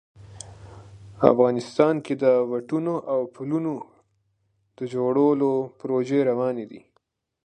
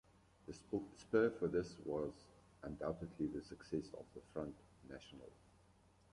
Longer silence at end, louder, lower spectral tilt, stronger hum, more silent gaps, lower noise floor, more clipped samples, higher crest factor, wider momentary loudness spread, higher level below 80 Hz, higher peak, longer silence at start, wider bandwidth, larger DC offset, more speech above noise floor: second, 0.65 s vs 0.8 s; first, -23 LUFS vs -43 LUFS; about the same, -7.5 dB/octave vs -7 dB/octave; neither; neither; about the same, -71 dBFS vs -70 dBFS; neither; about the same, 24 dB vs 22 dB; second, 16 LU vs 21 LU; about the same, -62 dBFS vs -66 dBFS; first, 0 dBFS vs -22 dBFS; second, 0.2 s vs 0.45 s; second, 9.6 kHz vs 11 kHz; neither; first, 49 dB vs 27 dB